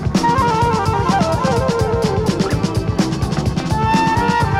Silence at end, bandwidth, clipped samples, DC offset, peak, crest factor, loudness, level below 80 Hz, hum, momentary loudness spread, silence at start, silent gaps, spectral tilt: 0 s; 15.5 kHz; under 0.1%; under 0.1%; -4 dBFS; 12 dB; -17 LUFS; -30 dBFS; none; 4 LU; 0 s; none; -6 dB/octave